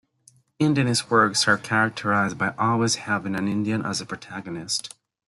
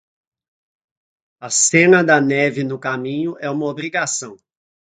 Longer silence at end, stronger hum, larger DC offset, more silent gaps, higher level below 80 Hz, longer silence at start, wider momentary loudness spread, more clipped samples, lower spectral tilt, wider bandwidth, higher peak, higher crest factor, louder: about the same, 0.4 s vs 0.45 s; neither; neither; neither; about the same, -64 dBFS vs -64 dBFS; second, 0.6 s vs 1.4 s; about the same, 12 LU vs 12 LU; neither; about the same, -4 dB/octave vs -3.5 dB/octave; first, 12 kHz vs 9.6 kHz; second, -4 dBFS vs 0 dBFS; about the same, 20 dB vs 20 dB; second, -23 LUFS vs -17 LUFS